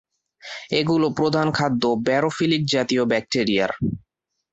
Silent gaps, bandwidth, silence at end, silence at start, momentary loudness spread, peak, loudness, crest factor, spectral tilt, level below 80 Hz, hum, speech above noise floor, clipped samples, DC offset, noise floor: none; 8.2 kHz; 0.55 s; 0.45 s; 7 LU; -6 dBFS; -21 LUFS; 16 dB; -5.5 dB/octave; -54 dBFS; none; 21 dB; under 0.1%; under 0.1%; -42 dBFS